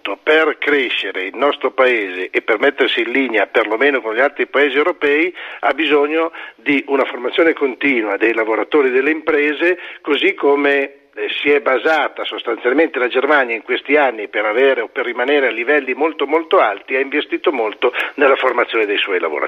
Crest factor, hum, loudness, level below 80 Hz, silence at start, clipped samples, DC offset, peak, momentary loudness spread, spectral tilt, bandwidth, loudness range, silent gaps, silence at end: 14 dB; none; -16 LUFS; -66 dBFS; 0.05 s; under 0.1%; under 0.1%; -2 dBFS; 6 LU; -4.5 dB/octave; 7 kHz; 1 LU; none; 0 s